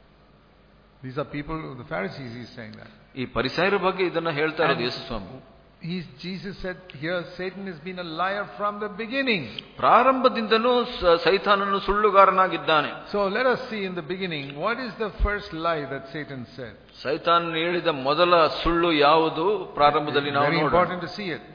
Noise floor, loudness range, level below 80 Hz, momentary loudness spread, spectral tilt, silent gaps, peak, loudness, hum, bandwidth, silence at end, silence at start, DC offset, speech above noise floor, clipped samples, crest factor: -55 dBFS; 10 LU; -42 dBFS; 16 LU; -6.5 dB/octave; none; -2 dBFS; -23 LUFS; none; 5.2 kHz; 0 s; 1.05 s; under 0.1%; 31 dB; under 0.1%; 22 dB